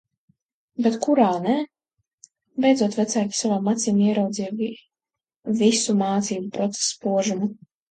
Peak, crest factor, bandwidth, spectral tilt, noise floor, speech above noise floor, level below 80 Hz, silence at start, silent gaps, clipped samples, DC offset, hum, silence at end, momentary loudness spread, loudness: -6 dBFS; 18 dB; 9.4 kHz; -4.5 dB/octave; -89 dBFS; 67 dB; -70 dBFS; 0.8 s; 2.13-2.18 s, 5.37-5.42 s; under 0.1%; under 0.1%; none; 0.35 s; 10 LU; -22 LUFS